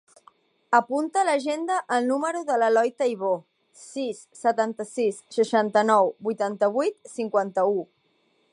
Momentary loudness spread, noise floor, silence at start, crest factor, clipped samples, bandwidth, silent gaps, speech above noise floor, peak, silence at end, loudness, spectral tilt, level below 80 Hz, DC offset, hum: 10 LU; -67 dBFS; 0.7 s; 18 dB; under 0.1%; 11.5 kHz; none; 43 dB; -6 dBFS; 0.7 s; -24 LUFS; -4.5 dB/octave; -82 dBFS; under 0.1%; none